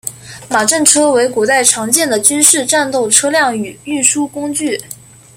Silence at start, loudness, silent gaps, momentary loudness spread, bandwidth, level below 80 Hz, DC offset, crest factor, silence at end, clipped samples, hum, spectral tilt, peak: 0.05 s; -11 LUFS; none; 12 LU; over 20 kHz; -56 dBFS; under 0.1%; 14 dB; 0.4 s; 0.3%; none; -1.5 dB/octave; 0 dBFS